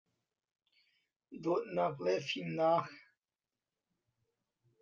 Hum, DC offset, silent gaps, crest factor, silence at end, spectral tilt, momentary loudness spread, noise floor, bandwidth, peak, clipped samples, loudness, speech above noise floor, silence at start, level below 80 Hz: none; under 0.1%; none; 20 dB; 1.8 s; -6 dB/octave; 12 LU; under -90 dBFS; 7.4 kHz; -18 dBFS; under 0.1%; -35 LUFS; over 56 dB; 1.3 s; -84 dBFS